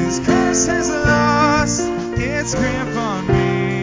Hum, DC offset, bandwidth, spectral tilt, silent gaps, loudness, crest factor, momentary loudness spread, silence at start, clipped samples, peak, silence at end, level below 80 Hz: none; under 0.1%; 7.6 kHz; -4.5 dB/octave; none; -17 LUFS; 16 dB; 7 LU; 0 s; under 0.1%; -2 dBFS; 0 s; -32 dBFS